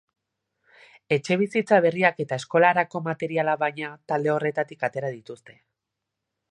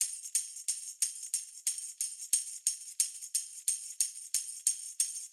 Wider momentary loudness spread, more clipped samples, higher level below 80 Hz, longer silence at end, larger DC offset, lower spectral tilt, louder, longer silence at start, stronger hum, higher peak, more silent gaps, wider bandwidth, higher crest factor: first, 13 LU vs 5 LU; neither; first, -74 dBFS vs under -90 dBFS; first, 1 s vs 0 s; neither; first, -6 dB/octave vs 8 dB/octave; first, -24 LUFS vs -33 LUFS; first, 1.1 s vs 0 s; neither; first, -4 dBFS vs -12 dBFS; neither; second, 10.5 kHz vs 19 kHz; about the same, 22 dB vs 24 dB